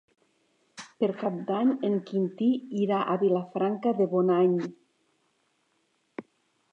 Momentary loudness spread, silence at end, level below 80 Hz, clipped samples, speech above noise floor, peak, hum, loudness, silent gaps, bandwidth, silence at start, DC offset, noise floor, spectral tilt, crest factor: 21 LU; 0.5 s; -82 dBFS; under 0.1%; 46 dB; -12 dBFS; none; -27 LUFS; none; 8.2 kHz; 0.75 s; under 0.1%; -72 dBFS; -8 dB/octave; 16 dB